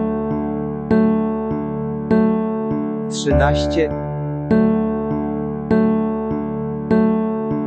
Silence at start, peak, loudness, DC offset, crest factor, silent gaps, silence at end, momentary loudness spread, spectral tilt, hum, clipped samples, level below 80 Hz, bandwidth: 0 s; -2 dBFS; -19 LUFS; under 0.1%; 16 dB; none; 0 s; 8 LU; -7.5 dB/octave; none; under 0.1%; -34 dBFS; 8.6 kHz